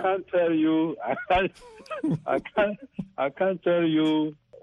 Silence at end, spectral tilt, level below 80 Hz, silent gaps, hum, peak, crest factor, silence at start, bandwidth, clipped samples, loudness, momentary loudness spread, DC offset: 0.05 s; -7.5 dB/octave; -54 dBFS; none; none; -12 dBFS; 14 dB; 0 s; 7 kHz; under 0.1%; -26 LUFS; 9 LU; under 0.1%